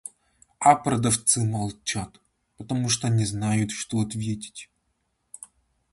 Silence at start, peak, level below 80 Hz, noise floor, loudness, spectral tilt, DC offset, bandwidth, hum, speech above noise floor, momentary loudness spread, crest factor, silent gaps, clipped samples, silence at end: 0.05 s; -4 dBFS; -54 dBFS; -74 dBFS; -24 LUFS; -4.5 dB/octave; under 0.1%; 11.5 kHz; none; 49 dB; 23 LU; 22 dB; none; under 0.1%; 0.45 s